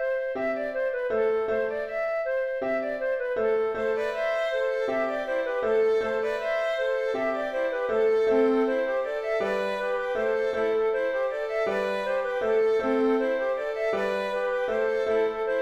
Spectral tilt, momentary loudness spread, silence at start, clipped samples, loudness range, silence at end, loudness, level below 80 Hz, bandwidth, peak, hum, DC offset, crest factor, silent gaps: -5 dB/octave; 5 LU; 0 s; under 0.1%; 2 LU; 0 s; -26 LUFS; -58 dBFS; 8.6 kHz; -12 dBFS; none; under 0.1%; 14 dB; none